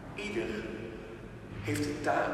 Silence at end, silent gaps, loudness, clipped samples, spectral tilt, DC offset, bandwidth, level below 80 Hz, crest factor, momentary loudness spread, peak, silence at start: 0 s; none; -36 LUFS; under 0.1%; -5.5 dB/octave; under 0.1%; 15.5 kHz; -54 dBFS; 18 dB; 14 LU; -18 dBFS; 0 s